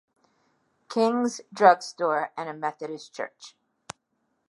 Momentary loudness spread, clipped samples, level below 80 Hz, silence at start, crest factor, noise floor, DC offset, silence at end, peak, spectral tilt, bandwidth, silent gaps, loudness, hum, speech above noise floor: 25 LU; under 0.1%; -78 dBFS; 0.9 s; 26 dB; -75 dBFS; under 0.1%; 1 s; -2 dBFS; -4 dB/octave; 11.5 kHz; none; -25 LUFS; none; 50 dB